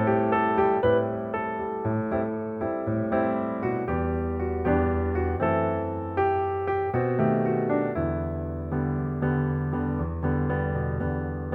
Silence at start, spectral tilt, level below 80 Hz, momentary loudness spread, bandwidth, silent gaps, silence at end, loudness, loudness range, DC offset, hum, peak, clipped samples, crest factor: 0 s; -11 dB/octave; -40 dBFS; 7 LU; 4.3 kHz; none; 0 s; -26 LUFS; 2 LU; under 0.1%; none; -10 dBFS; under 0.1%; 16 dB